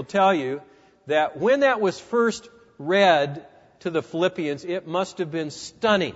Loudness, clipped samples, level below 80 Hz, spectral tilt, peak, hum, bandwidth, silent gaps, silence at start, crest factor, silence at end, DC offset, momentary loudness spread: -23 LUFS; under 0.1%; -66 dBFS; -5 dB/octave; -4 dBFS; none; 8 kHz; none; 0 s; 20 dB; 0 s; under 0.1%; 13 LU